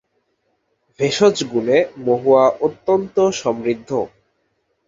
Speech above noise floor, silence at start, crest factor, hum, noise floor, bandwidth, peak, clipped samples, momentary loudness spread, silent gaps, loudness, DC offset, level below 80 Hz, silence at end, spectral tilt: 51 dB; 1 s; 18 dB; none; -68 dBFS; 7.8 kHz; -2 dBFS; under 0.1%; 9 LU; none; -18 LUFS; under 0.1%; -60 dBFS; 0.8 s; -5 dB/octave